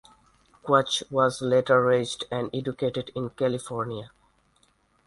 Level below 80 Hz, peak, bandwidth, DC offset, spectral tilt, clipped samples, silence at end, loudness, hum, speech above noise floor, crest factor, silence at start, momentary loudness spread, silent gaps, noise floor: -62 dBFS; -6 dBFS; 11.5 kHz; under 0.1%; -5 dB/octave; under 0.1%; 1 s; -25 LUFS; none; 40 dB; 22 dB; 0.65 s; 12 LU; none; -65 dBFS